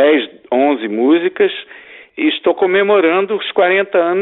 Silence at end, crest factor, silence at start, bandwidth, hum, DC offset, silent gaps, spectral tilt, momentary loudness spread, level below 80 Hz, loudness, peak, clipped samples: 0 s; 12 dB; 0 s; 4.1 kHz; none; under 0.1%; none; -9 dB/octave; 7 LU; -66 dBFS; -14 LUFS; -2 dBFS; under 0.1%